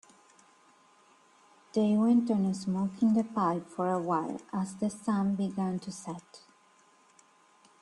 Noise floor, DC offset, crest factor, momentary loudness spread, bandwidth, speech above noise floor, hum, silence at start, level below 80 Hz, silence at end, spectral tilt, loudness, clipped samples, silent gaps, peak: -63 dBFS; under 0.1%; 16 dB; 11 LU; 11 kHz; 34 dB; none; 1.75 s; -74 dBFS; 1.45 s; -7.5 dB/octave; -30 LUFS; under 0.1%; none; -16 dBFS